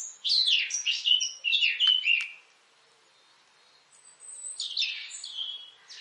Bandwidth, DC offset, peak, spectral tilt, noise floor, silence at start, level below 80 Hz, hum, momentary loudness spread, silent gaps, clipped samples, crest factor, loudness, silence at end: 11.5 kHz; under 0.1%; -10 dBFS; 6.5 dB/octave; -62 dBFS; 0 s; under -90 dBFS; none; 17 LU; none; under 0.1%; 20 dB; -25 LUFS; 0 s